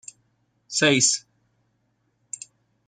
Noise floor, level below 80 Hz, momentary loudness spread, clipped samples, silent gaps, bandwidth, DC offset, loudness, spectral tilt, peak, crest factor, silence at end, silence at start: -70 dBFS; -70 dBFS; 21 LU; under 0.1%; none; 10.5 kHz; under 0.1%; -20 LUFS; -2 dB/octave; -6 dBFS; 22 dB; 1.7 s; 0.7 s